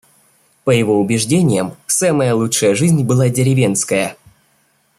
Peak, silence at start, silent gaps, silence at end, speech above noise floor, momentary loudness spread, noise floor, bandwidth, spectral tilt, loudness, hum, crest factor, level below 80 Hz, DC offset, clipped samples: -2 dBFS; 0.65 s; none; 0.85 s; 45 dB; 4 LU; -59 dBFS; 15.5 kHz; -5 dB/octave; -15 LUFS; none; 14 dB; -54 dBFS; under 0.1%; under 0.1%